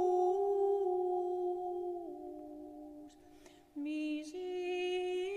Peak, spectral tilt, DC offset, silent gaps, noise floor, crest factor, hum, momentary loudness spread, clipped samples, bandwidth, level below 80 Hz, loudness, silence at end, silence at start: -22 dBFS; -4 dB/octave; under 0.1%; none; -59 dBFS; 14 dB; none; 18 LU; under 0.1%; 10 kHz; -74 dBFS; -36 LUFS; 0 s; 0 s